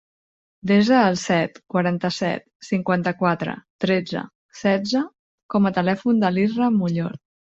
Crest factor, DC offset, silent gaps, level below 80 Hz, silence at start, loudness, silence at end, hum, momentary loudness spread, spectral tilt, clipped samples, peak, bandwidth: 18 dB; under 0.1%; 2.55-2.60 s, 3.70-3.79 s, 4.35-4.49 s, 5.19-5.49 s; -62 dBFS; 0.65 s; -21 LUFS; 0.4 s; none; 12 LU; -6.5 dB/octave; under 0.1%; -4 dBFS; 7.8 kHz